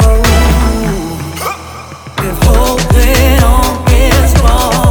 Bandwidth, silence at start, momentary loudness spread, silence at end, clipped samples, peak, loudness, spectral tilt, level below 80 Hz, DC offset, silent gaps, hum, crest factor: over 20 kHz; 0 s; 11 LU; 0 s; 0.3%; 0 dBFS; -10 LUFS; -5 dB/octave; -10 dBFS; under 0.1%; none; none; 8 dB